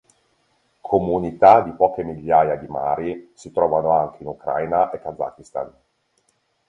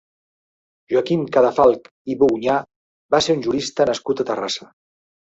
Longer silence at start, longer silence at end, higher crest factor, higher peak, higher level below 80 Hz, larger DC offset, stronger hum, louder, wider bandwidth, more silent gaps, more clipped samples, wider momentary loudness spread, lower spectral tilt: about the same, 0.85 s vs 0.9 s; first, 1 s vs 0.8 s; about the same, 20 dB vs 18 dB; about the same, 0 dBFS vs -2 dBFS; about the same, -52 dBFS vs -56 dBFS; neither; neither; about the same, -20 LUFS vs -19 LUFS; first, 9.8 kHz vs 8 kHz; second, none vs 1.91-2.05 s, 2.76-3.09 s; neither; first, 17 LU vs 9 LU; first, -7.5 dB/octave vs -5 dB/octave